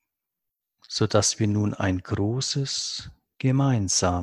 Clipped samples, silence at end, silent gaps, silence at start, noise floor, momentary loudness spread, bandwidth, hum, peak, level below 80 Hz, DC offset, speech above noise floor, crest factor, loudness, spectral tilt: under 0.1%; 0 s; none; 0.9 s; -84 dBFS; 7 LU; 12 kHz; none; -6 dBFS; -44 dBFS; under 0.1%; 60 dB; 20 dB; -24 LUFS; -4.5 dB/octave